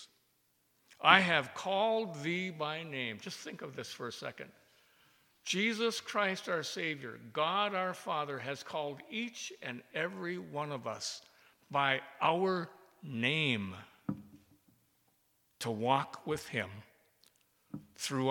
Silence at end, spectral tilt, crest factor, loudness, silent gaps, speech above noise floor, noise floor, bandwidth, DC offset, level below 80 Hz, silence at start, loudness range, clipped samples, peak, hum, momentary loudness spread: 0 s; -4 dB/octave; 30 dB; -34 LUFS; none; 40 dB; -75 dBFS; 19 kHz; under 0.1%; -78 dBFS; 0 s; 8 LU; under 0.1%; -6 dBFS; none; 13 LU